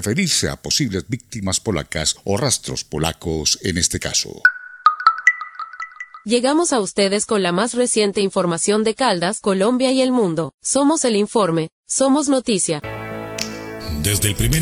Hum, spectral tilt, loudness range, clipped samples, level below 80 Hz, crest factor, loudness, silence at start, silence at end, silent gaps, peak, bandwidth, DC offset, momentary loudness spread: none; -3.5 dB/octave; 2 LU; under 0.1%; -40 dBFS; 20 dB; -18 LUFS; 0 s; 0 s; 10.54-10.58 s, 11.72-11.83 s; 0 dBFS; 16 kHz; under 0.1%; 10 LU